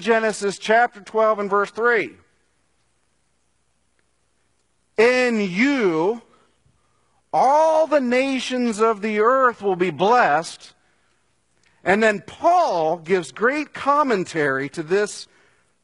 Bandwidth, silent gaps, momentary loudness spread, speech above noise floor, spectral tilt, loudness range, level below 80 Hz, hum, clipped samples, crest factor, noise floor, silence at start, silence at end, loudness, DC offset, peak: 11 kHz; none; 8 LU; 49 dB; -4.5 dB/octave; 5 LU; -66 dBFS; none; under 0.1%; 18 dB; -69 dBFS; 0 s; 0.6 s; -19 LUFS; under 0.1%; -2 dBFS